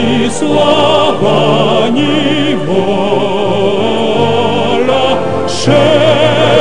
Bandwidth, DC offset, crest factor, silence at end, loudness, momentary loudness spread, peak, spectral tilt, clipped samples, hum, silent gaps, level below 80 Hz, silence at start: 11 kHz; 8%; 10 dB; 0 s; -10 LUFS; 4 LU; 0 dBFS; -5.5 dB/octave; 0.4%; none; none; -44 dBFS; 0 s